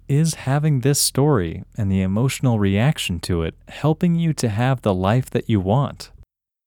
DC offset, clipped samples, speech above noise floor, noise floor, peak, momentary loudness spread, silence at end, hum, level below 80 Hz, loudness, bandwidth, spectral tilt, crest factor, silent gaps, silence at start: under 0.1%; under 0.1%; 33 dB; -52 dBFS; -4 dBFS; 7 LU; 0.6 s; none; -44 dBFS; -20 LUFS; 19 kHz; -5.5 dB/octave; 16 dB; none; 0.1 s